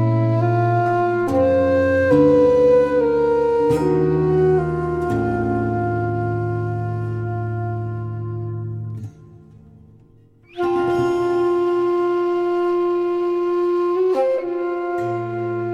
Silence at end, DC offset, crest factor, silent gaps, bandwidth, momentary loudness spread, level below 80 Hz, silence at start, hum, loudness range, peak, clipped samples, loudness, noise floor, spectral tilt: 0 s; under 0.1%; 14 dB; none; 8.8 kHz; 11 LU; -46 dBFS; 0 s; none; 11 LU; -4 dBFS; under 0.1%; -19 LUFS; -50 dBFS; -9 dB/octave